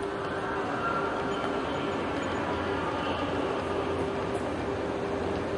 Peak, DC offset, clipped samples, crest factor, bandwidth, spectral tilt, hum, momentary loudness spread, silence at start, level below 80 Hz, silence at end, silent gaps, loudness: -18 dBFS; under 0.1%; under 0.1%; 12 dB; 11.5 kHz; -6 dB/octave; none; 2 LU; 0 s; -52 dBFS; 0 s; none; -31 LUFS